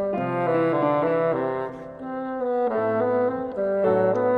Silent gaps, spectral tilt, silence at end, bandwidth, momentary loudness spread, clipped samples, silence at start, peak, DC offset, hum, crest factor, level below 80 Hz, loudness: none; -9 dB/octave; 0 s; 4.9 kHz; 10 LU; under 0.1%; 0 s; -10 dBFS; under 0.1%; none; 14 dB; -62 dBFS; -24 LUFS